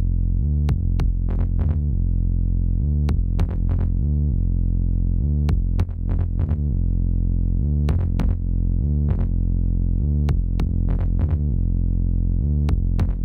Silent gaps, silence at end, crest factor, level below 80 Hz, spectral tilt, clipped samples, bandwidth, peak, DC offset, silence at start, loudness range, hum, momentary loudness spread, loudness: none; 0 s; 12 dB; -22 dBFS; -10 dB/octave; under 0.1%; 4.4 kHz; -8 dBFS; under 0.1%; 0 s; 0 LU; none; 2 LU; -23 LUFS